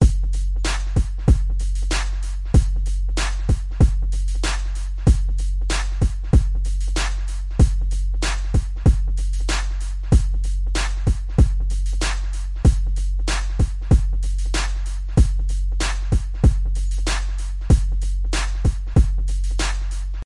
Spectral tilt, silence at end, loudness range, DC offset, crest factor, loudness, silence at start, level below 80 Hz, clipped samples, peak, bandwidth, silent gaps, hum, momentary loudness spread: -5.5 dB/octave; 0 s; 1 LU; under 0.1%; 14 dB; -22 LUFS; 0 s; -20 dBFS; under 0.1%; -4 dBFS; 11.5 kHz; none; none; 6 LU